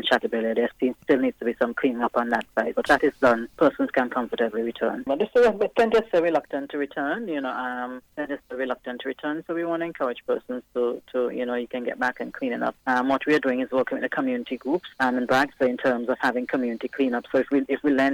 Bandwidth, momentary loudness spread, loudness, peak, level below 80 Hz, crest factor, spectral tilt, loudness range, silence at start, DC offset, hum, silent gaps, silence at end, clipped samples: 17.5 kHz; 9 LU; -25 LUFS; -8 dBFS; -60 dBFS; 16 dB; -5.5 dB/octave; 6 LU; 0 s; under 0.1%; none; none; 0 s; under 0.1%